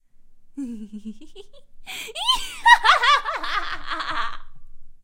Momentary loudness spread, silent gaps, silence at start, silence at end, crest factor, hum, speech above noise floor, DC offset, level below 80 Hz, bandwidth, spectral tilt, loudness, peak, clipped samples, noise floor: 22 LU; none; 0.2 s; 0.1 s; 24 dB; none; 10 dB; under 0.1%; -40 dBFS; 16 kHz; -1 dB/octave; -19 LUFS; 0 dBFS; under 0.1%; -45 dBFS